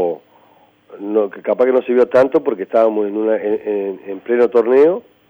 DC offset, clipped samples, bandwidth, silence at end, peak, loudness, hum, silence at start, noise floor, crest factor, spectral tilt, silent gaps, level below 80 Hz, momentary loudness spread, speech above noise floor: under 0.1%; under 0.1%; over 20 kHz; 0.3 s; -2 dBFS; -16 LUFS; none; 0 s; -51 dBFS; 14 dB; -7.5 dB/octave; none; -66 dBFS; 9 LU; 36 dB